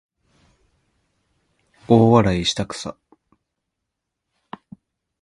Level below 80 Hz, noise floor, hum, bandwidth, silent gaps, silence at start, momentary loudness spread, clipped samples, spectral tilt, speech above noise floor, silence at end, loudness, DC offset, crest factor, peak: -46 dBFS; -80 dBFS; none; 11 kHz; none; 1.9 s; 27 LU; under 0.1%; -6 dB/octave; 64 dB; 2.3 s; -18 LUFS; under 0.1%; 22 dB; 0 dBFS